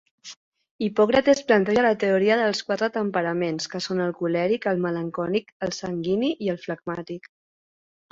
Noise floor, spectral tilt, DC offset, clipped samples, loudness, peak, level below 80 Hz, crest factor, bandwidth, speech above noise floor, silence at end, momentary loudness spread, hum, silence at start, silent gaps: under -90 dBFS; -5.5 dB/octave; under 0.1%; under 0.1%; -24 LUFS; -6 dBFS; -62 dBFS; 18 dB; 7.8 kHz; over 67 dB; 0.95 s; 12 LU; none; 0.25 s; 0.37-0.52 s, 0.71-0.79 s, 5.52-5.60 s